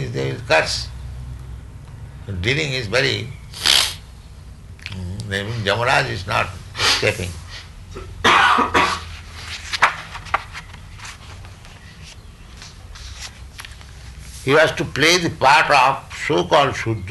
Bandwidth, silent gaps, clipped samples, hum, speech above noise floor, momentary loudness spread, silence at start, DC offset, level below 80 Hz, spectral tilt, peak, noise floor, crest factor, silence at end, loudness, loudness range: 12 kHz; none; under 0.1%; none; 22 dB; 24 LU; 0 s; under 0.1%; -40 dBFS; -3 dB/octave; -2 dBFS; -40 dBFS; 18 dB; 0 s; -18 LUFS; 15 LU